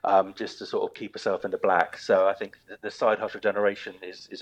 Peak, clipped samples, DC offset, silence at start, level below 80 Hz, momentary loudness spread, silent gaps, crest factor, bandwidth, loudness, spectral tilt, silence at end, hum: -6 dBFS; under 0.1%; under 0.1%; 0.05 s; -74 dBFS; 15 LU; none; 20 dB; 9.2 kHz; -26 LUFS; -4.5 dB/octave; 0 s; none